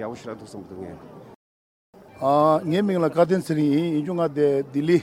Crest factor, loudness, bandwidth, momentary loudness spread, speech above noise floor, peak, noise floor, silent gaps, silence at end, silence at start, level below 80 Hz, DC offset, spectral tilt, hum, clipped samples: 18 dB; -22 LUFS; 15 kHz; 18 LU; over 68 dB; -4 dBFS; under -90 dBFS; 1.35-1.93 s; 0 s; 0 s; -66 dBFS; under 0.1%; -7.5 dB/octave; none; under 0.1%